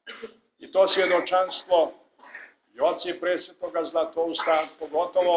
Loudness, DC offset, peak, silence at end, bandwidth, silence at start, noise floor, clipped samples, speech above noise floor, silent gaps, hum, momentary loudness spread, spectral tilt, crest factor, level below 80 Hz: -25 LUFS; under 0.1%; -8 dBFS; 0 s; 4 kHz; 0.05 s; -47 dBFS; under 0.1%; 23 dB; none; none; 21 LU; -7 dB/octave; 18 dB; -72 dBFS